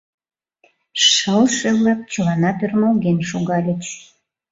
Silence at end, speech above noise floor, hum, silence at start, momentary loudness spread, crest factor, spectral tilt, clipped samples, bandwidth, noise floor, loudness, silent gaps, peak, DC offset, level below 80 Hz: 0.5 s; 42 dB; none; 0.95 s; 12 LU; 16 dB; -4 dB/octave; under 0.1%; 8 kHz; -60 dBFS; -17 LUFS; none; -2 dBFS; under 0.1%; -56 dBFS